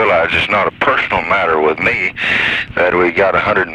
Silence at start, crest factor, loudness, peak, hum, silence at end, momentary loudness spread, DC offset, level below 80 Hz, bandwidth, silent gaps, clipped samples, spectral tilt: 0 s; 12 dB; -13 LUFS; 0 dBFS; none; 0 s; 2 LU; under 0.1%; -42 dBFS; 11 kHz; none; under 0.1%; -5.5 dB/octave